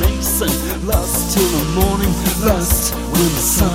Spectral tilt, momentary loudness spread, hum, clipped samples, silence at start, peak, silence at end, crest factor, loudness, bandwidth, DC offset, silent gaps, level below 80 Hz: -4 dB/octave; 4 LU; none; under 0.1%; 0 s; 0 dBFS; 0 s; 16 dB; -16 LUFS; 16.5 kHz; under 0.1%; none; -22 dBFS